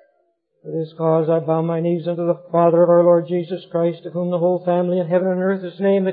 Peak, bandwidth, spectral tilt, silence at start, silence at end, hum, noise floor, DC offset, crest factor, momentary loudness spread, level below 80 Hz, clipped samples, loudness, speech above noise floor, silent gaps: -4 dBFS; 4.6 kHz; -13 dB/octave; 0.65 s; 0 s; none; -66 dBFS; under 0.1%; 16 dB; 10 LU; -78 dBFS; under 0.1%; -19 LUFS; 48 dB; none